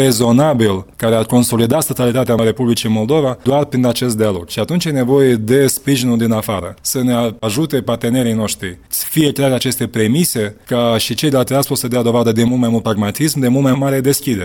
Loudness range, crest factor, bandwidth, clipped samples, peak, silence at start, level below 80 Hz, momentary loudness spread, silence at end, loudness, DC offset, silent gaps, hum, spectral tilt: 2 LU; 14 dB; 18 kHz; under 0.1%; 0 dBFS; 0 s; -46 dBFS; 6 LU; 0 s; -15 LUFS; under 0.1%; none; none; -5 dB/octave